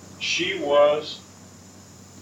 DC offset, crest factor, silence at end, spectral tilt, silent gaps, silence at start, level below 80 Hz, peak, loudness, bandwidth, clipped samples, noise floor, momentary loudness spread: under 0.1%; 18 dB; 0 s; -2.5 dB/octave; none; 0 s; -70 dBFS; -8 dBFS; -21 LUFS; 9.6 kHz; under 0.1%; -46 dBFS; 16 LU